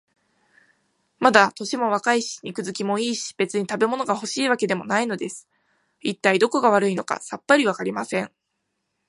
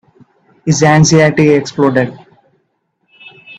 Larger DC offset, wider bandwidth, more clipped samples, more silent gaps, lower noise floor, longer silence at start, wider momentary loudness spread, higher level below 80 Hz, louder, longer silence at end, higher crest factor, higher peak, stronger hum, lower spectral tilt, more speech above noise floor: neither; first, 11.5 kHz vs 8.4 kHz; neither; neither; first, -77 dBFS vs -64 dBFS; first, 1.2 s vs 0.65 s; about the same, 12 LU vs 10 LU; second, -72 dBFS vs -46 dBFS; second, -22 LUFS vs -11 LUFS; first, 0.8 s vs 0.05 s; first, 22 dB vs 14 dB; about the same, 0 dBFS vs 0 dBFS; neither; second, -4 dB/octave vs -5.5 dB/octave; about the same, 55 dB vs 54 dB